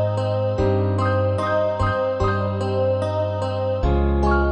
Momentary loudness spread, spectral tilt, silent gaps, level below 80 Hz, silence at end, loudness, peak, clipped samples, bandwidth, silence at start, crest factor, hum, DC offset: 3 LU; -8 dB/octave; none; -28 dBFS; 0 s; -21 LUFS; -8 dBFS; under 0.1%; 9 kHz; 0 s; 12 dB; none; under 0.1%